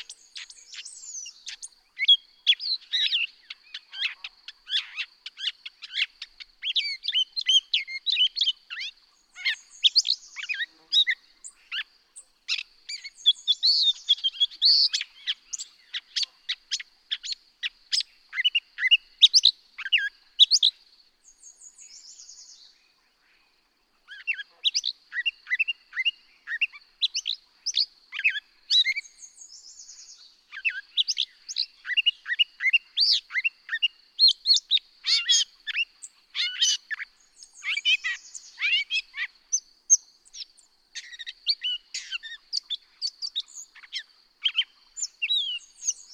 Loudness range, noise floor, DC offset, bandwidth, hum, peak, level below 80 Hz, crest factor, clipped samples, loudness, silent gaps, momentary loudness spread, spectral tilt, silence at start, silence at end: 9 LU; -68 dBFS; under 0.1%; 16 kHz; none; -4 dBFS; -76 dBFS; 24 dB; under 0.1%; -24 LUFS; none; 21 LU; 7.5 dB/octave; 0 s; 0 s